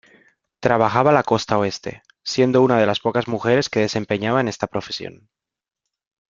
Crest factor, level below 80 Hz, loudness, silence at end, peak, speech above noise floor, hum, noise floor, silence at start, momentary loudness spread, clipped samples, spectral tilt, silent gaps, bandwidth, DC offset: 20 dB; -56 dBFS; -19 LUFS; 1.2 s; 0 dBFS; 69 dB; none; -87 dBFS; 0.6 s; 14 LU; under 0.1%; -5.5 dB/octave; none; 7.6 kHz; under 0.1%